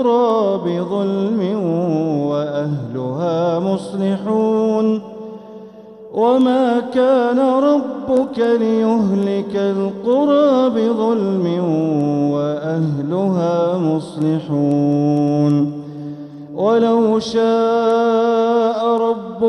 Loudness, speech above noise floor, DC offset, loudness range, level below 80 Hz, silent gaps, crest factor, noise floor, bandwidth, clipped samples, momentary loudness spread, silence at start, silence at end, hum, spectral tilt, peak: -17 LUFS; 21 dB; under 0.1%; 3 LU; -60 dBFS; none; 12 dB; -37 dBFS; 10.5 kHz; under 0.1%; 7 LU; 0 s; 0 s; none; -8 dB/octave; -4 dBFS